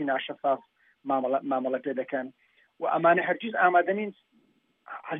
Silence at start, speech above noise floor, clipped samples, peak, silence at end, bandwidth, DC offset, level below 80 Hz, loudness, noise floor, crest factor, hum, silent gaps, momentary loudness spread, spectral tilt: 0 s; 40 dB; under 0.1%; -10 dBFS; 0 s; 3.8 kHz; under 0.1%; -90 dBFS; -27 LUFS; -67 dBFS; 18 dB; none; none; 15 LU; -9 dB/octave